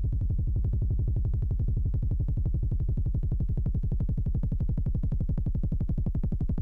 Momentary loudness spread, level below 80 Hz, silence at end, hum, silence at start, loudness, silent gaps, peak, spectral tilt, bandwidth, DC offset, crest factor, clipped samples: 1 LU; -28 dBFS; 0 s; none; 0 s; -30 LUFS; none; -18 dBFS; -12.5 dB/octave; 1.6 kHz; under 0.1%; 8 dB; under 0.1%